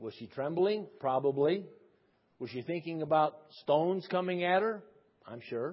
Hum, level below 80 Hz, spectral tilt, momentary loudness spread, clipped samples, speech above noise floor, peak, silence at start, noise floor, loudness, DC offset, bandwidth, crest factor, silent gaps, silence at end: none; -80 dBFS; -4.5 dB/octave; 14 LU; under 0.1%; 39 dB; -14 dBFS; 0 s; -71 dBFS; -32 LUFS; under 0.1%; 5.6 kHz; 18 dB; none; 0 s